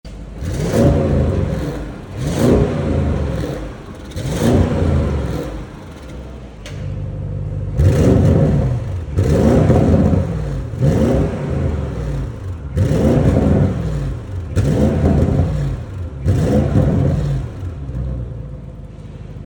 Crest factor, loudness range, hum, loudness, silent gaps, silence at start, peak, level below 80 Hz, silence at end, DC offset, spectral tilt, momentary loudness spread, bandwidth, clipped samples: 16 dB; 6 LU; none; -17 LUFS; none; 0.05 s; -2 dBFS; -26 dBFS; 0 s; under 0.1%; -8 dB/octave; 18 LU; 19 kHz; under 0.1%